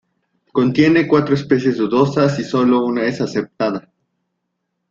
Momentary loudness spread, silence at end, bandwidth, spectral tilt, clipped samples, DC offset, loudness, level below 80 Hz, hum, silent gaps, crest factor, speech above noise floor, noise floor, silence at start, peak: 8 LU; 1.1 s; 7.6 kHz; -7 dB/octave; under 0.1%; under 0.1%; -16 LUFS; -56 dBFS; none; none; 16 dB; 59 dB; -74 dBFS; 0.55 s; 0 dBFS